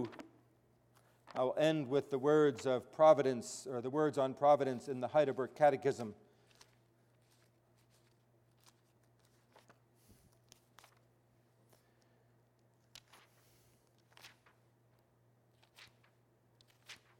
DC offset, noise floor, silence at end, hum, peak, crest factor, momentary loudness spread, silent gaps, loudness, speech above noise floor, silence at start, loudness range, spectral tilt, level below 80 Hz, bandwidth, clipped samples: under 0.1%; -72 dBFS; 0.25 s; none; -16 dBFS; 24 dB; 16 LU; none; -34 LUFS; 39 dB; 0 s; 7 LU; -6 dB/octave; -84 dBFS; 13.5 kHz; under 0.1%